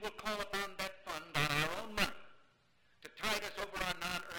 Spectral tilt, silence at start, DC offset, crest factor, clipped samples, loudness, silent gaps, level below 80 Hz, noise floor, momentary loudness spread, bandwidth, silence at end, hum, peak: -3 dB/octave; 0 s; under 0.1%; 22 dB; under 0.1%; -38 LUFS; none; -58 dBFS; -72 dBFS; 10 LU; 19 kHz; 0 s; none; -18 dBFS